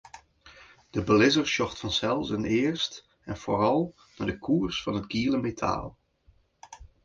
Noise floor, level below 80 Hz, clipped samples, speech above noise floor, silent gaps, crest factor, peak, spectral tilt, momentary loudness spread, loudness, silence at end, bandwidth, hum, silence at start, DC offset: -63 dBFS; -52 dBFS; under 0.1%; 37 dB; none; 20 dB; -8 dBFS; -5 dB/octave; 13 LU; -27 LUFS; 0.2 s; 7.6 kHz; none; 0.15 s; under 0.1%